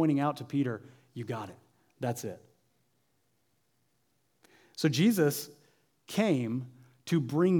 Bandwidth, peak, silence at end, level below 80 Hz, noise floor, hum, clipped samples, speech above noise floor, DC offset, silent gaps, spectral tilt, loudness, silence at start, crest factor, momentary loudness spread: 19.5 kHz; -14 dBFS; 0 s; -82 dBFS; -75 dBFS; none; under 0.1%; 46 dB; under 0.1%; none; -6 dB/octave; -31 LUFS; 0 s; 18 dB; 21 LU